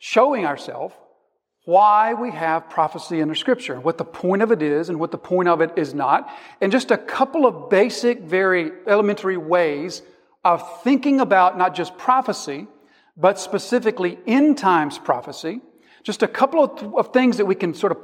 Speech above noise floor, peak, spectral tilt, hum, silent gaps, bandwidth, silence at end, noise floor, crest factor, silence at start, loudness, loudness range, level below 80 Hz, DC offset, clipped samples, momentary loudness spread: 48 dB; -2 dBFS; -5.5 dB/octave; none; none; 14.5 kHz; 0 s; -68 dBFS; 18 dB; 0 s; -19 LUFS; 2 LU; -74 dBFS; under 0.1%; under 0.1%; 11 LU